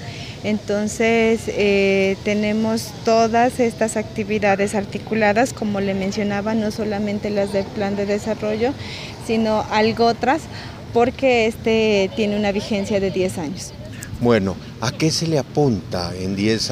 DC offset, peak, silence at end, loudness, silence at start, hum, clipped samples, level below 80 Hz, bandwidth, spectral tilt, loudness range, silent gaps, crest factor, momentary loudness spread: under 0.1%; -2 dBFS; 0 s; -20 LUFS; 0 s; none; under 0.1%; -44 dBFS; 15.5 kHz; -5 dB/octave; 3 LU; none; 16 dB; 9 LU